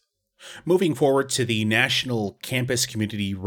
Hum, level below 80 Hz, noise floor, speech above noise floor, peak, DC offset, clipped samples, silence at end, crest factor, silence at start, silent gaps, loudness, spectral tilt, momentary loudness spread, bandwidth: none; -60 dBFS; -49 dBFS; 26 dB; -6 dBFS; under 0.1%; under 0.1%; 0 s; 18 dB; 0.4 s; none; -22 LUFS; -4 dB/octave; 8 LU; 19.5 kHz